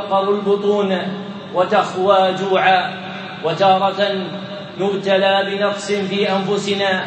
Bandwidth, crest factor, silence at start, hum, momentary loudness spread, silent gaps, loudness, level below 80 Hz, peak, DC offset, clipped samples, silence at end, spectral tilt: 8.6 kHz; 16 dB; 0 s; none; 11 LU; none; -17 LUFS; -68 dBFS; 0 dBFS; under 0.1%; under 0.1%; 0 s; -5 dB/octave